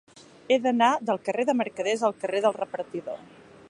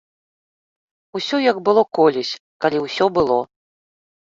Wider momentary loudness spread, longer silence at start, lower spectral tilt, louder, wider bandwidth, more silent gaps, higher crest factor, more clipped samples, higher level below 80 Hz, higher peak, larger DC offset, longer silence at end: about the same, 12 LU vs 11 LU; second, 0.5 s vs 1.15 s; about the same, -4 dB/octave vs -5 dB/octave; second, -26 LUFS vs -19 LUFS; first, 11 kHz vs 7.6 kHz; second, none vs 2.40-2.60 s; about the same, 18 dB vs 18 dB; neither; second, -74 dBFS vs -56 dBFS; second, -8 dBFS vs -2 dBFS; neither; second, 0.45 s vs 0.8 s